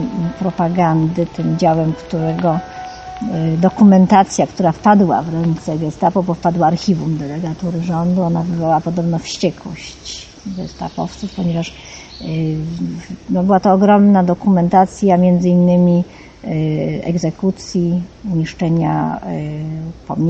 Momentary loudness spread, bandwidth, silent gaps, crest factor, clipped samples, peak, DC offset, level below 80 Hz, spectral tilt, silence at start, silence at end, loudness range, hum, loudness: 15 LU; 8.4 kHz; none; 16 dB; under 0.1%; 0 dBFS; under 0.1%; -44 dBFS; -7.5 dB/octave; 0 s; 0 s; 9 LU; none; -16 LUFS